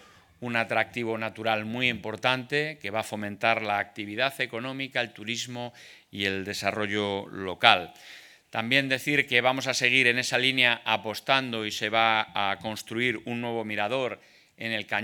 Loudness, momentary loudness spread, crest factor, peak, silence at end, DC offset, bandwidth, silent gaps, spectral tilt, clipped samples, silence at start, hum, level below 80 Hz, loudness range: -26 LUFS; 12 LU; 28 dB; 0 dBFS; 0 s; under 0.1%; 19 kHz; none; -3.5 dB/octave; under 0.1%; 0.4 s; none; -72 dBFS; 7 LU